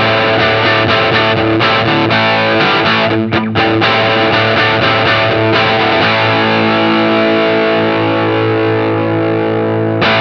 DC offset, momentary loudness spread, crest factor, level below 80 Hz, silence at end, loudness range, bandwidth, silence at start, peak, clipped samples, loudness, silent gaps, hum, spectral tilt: under 0.1%; 4 LU; 12 dB; -44 dBFS; 0 s; 2 LU; 6.6 kHz; 0 s; 0 dBFS; under 0.1%; -11 LUFS; none; none; -6.5 dB/octave